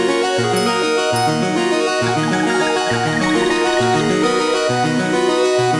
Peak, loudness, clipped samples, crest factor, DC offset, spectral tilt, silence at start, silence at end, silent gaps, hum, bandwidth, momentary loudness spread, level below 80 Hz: -4 dBFS; -16 LUFS; under 0.1%; 12 dB; under 0.1%; -4.5 dB/octave; 0 s; 0 s; none; none; 11.5 kHz; 1 LU; -50 dBFS